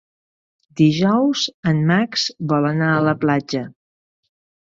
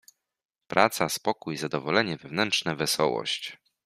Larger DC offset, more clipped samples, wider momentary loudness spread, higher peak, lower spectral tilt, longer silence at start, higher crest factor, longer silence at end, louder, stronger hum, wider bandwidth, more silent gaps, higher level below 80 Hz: neither; neither; about the same, 9 LU vs 7 LU; about the same, -4 dBFS vs -2 dBFS; first, -6 dB/octave vs -3.5 dB/octave; about the same, 0.75 s vs 0.7 s; second, 16 dB vs 26 dB; first, 1 s vs 0.3 s; first, -18 LUFS vs -26 LUFS; neither; second, 7.6 kHz vs 15.5 kHz; first, 1.54-1.63 s vs none; first, -58 dBFS vs -68 dBFS